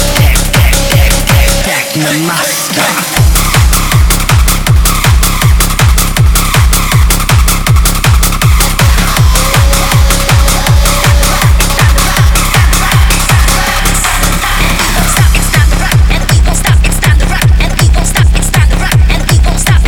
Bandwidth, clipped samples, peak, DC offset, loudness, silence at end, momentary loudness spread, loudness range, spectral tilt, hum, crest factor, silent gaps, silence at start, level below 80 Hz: 19 kHz; 0.5%; 0 dBFS; under 0.1%; -8 LUFS; 0 s; 2 LU; 1 LU; -3.5 dB/octave; none; 6 dB; none; 0 s; -10 dBFS